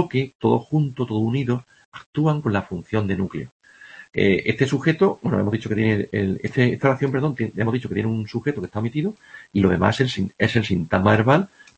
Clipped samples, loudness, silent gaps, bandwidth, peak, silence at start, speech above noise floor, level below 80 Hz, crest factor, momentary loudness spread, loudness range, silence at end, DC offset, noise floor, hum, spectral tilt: under 0.1%; -22 LUFS; 0.35-0.40 s, 1.85-1.92 s, 2.06-2.13 s, 3.51-3.60 s; 8.6 kHz; -2 dBFS; 0 s; 24 dB; -52 dBFS; 20 dB; 8 LU; 3 LU; 0.3 s; under 0.1%; -45 dBFS; none; -7.5 dB/octave